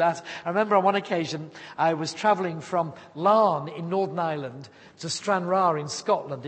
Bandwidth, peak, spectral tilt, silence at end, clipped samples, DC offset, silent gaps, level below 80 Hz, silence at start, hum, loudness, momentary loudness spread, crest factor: 8.8 kHz; -6 dBFS; -5 dB/octave; 0 s; under 0.1%; under 0.1%; none; -74 dBFS; 0 s; none; -25 LUFS; 12 LU; 18 dB